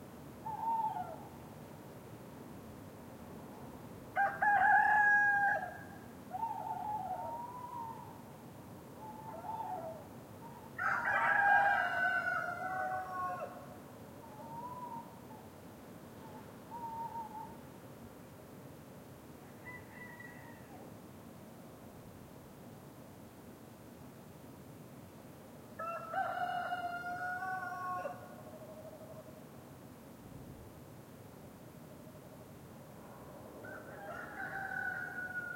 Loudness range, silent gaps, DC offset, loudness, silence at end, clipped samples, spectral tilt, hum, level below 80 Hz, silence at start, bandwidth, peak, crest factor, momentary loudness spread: 22 LU; none; under 0.1%; -35 LUFS; 0 s; under 0.1%; -5 dB/octave; none; -72 dBFS; 0 s; 16.5 kHz; -18 dBFS; 22 dB; 22 LU